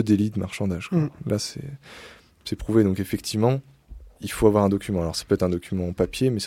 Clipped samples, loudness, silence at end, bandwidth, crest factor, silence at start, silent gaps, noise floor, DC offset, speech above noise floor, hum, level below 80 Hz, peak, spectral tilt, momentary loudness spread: under 0.1%; -24 LUFS; 0 s; 16.5 kHz; 20 dB; 0 s; none; -44 dBFS; under 0.1%; 21 dB; none; -44 dBFS; -4 dBFS; -6.5 dB/octave; 16 LU